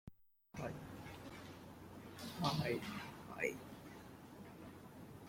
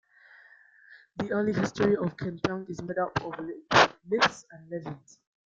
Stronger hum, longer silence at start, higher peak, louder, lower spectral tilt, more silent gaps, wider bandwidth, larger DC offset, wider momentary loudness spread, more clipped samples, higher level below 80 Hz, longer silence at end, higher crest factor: neither; second, 0.05 s vs 0.9 s; second, -22 dBFS vs -4 dBFS; second, -47 LUFS vs -28 LUFS; about the same, -5 dB/octave vs -5 dB/octave; neither; first, 16.5 kHz vs 7.8 kHz; neither; about the same, 16 LU vs 18 LU; neither; second, -70 dBFS vs -60 dBFS; second, 0 s vs 0.45 s; about the same, 26 dB vs 26 dB